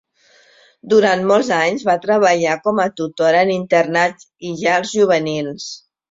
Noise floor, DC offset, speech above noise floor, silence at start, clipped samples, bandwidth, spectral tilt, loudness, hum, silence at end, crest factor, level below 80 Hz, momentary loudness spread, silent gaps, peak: -53 dBFS; under 0.1%; 37 dB; 0.85 s; under 0.1%; 7.8 kHz; -4.5 dB/octave; -16 LUFS; none; 0.35 s; 16 dB; -62 dBFS; 12 LU; none; -2 dBFS